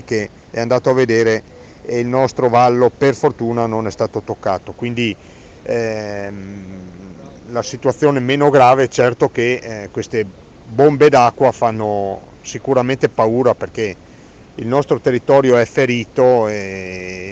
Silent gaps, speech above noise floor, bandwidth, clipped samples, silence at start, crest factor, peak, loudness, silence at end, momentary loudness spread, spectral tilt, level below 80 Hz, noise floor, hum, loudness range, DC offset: none; 26 dB; 8.2 kHz; under 0.1%; 0.05 s; 16 dB; 0 dBFS; -15 LUFS; 0 s; 16 LU; -6 dB/octave; -50 dBFS; -41 dBFS; none; 7 LU; under 0.1%